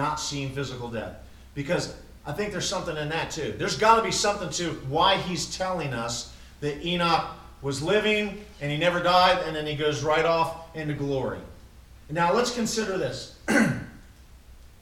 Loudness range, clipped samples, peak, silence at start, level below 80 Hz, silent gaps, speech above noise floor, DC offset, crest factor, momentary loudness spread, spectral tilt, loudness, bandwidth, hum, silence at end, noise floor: 4 LU; under 0.1%; -6 dBFS; 0 s; -48 dBFS; none; 24 dB; under 0.1%; 22 dB; 14 LU; -4 dB/octave; -26 LUFS; 16.5 kHz; none; 0.15 s; -49 dBFS